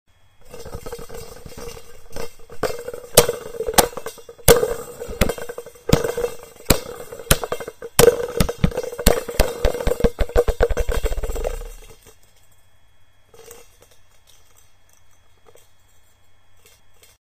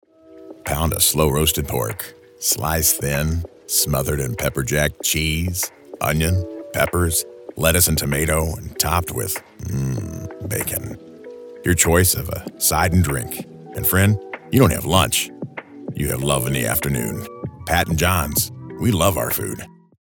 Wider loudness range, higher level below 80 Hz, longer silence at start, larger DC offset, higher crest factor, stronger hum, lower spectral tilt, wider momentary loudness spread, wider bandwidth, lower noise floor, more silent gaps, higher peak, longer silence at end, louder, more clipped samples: first, 9 LU vs 3 LU; first, -30 dBFS vs -36 dBFS; about the same, 0.4 s vs 0.3 s; first, 0.3% vs under 0.1%; about the same, 22 dB vs 20 dB; neither; about the same, -3.5 dB/octave vs -4 dB/octave; first, 21 LU vs 15 LU; second, 15.5 kHz vs 19 kHz; first, -56 dBFS vs -42 dBFS; neither; about the same, 0 dBFS vs 0 dBFS; first, 3.65 s vs 0.4 s; about the same, -20 LUFS vs -20 LUFS; neither